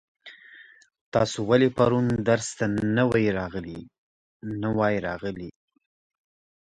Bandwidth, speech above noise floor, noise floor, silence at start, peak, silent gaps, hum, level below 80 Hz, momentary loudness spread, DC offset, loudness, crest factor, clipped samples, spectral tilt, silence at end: 10.5 kHz; 27 dB; -51 dBFS; 0.25 s; -6 dBFS; 1.01-1.12 s, 3.98-4.40 s; none; -54 dBFS; 18 LU; under 0.1%; -25 LUFS; 20 dB; under 0.1%; -6 dB/octave; 1.2 s